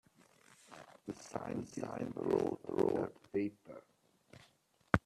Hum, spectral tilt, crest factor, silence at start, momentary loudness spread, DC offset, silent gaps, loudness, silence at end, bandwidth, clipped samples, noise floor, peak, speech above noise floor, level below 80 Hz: none; -7 dB/octave; 32 dB; 0.7 s; 21 LU; under 0.1%; none; -39 LUFS; 0.05 s; 13 kHz; under 0.1%; -72 dBFS; -8 dBFS; 34 dB; -64 dBFS